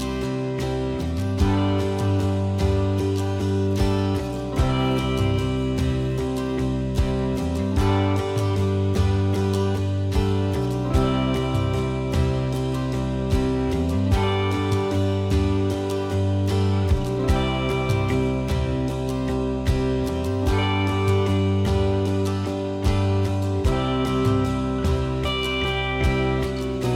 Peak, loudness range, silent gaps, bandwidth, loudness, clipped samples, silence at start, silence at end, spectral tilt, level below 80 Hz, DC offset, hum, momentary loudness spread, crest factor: -6 dBFS; 1 LU; none; 13.5 kHz; -23 LUFS; under 0.1%; 0 s; 0 s; -7 dB/octave; -30 dBFS; under 0.1%; none; 4 LU; 16 dB